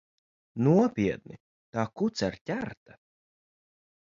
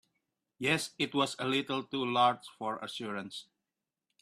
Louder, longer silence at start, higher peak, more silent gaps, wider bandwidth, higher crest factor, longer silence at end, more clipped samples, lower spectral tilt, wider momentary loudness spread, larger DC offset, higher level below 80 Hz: first, -28 LUFS vs -32 LUFS; about the same, 0.55 s vs 0.6 s; about the same, -10 dBFS vs -12 dBFS; first, 1.40-1.73 s, 2.41-2.46 s vs none; second, 7.6 kHz vs 14 kHz; about the same, 20 dB vs 22 dB; first, 1.4 s vs 0.8 s; neither; first, -7 dB/octave vs -4 dB/octave; first, 16 LU vs 11 LU; neither; first, -60 dBFS vs -76 dBFS